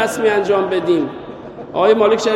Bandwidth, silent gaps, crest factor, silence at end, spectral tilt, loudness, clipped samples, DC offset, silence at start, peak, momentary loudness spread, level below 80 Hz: 13 kHz; none; 16 dB; 0 s; -4.5 dB/octave; -16 LUFS; under 0.1%; under 0.1%; 0 s; 0 dBFS; 19 LU; -54 dBFS